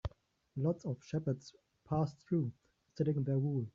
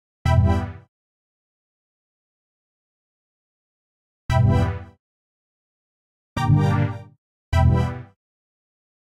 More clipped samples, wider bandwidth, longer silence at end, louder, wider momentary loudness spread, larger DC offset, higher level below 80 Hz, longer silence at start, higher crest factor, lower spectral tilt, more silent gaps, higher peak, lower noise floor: neither; second, 7.4 kHz vs 10.5 kHz; second, 0.05 s vs 1.05 s; second, -37 LUFS vs -21 LUFS; second, 13 LU vs 16 LU; neither; second, -60 dBFS vs -34 dBFS; second, 0.05 s vs 0.25 s; about the same, 16 dB vs 18 dB; first, -9.5 dB/octave vs -8 dB/octave; second, none vs 0.88-4.29 s, 4.99-6.36 s, 7.18-7.52 s; second, -22 dBFS vs -6 dBFS; second, -62 dBFS vs under -90 dBFS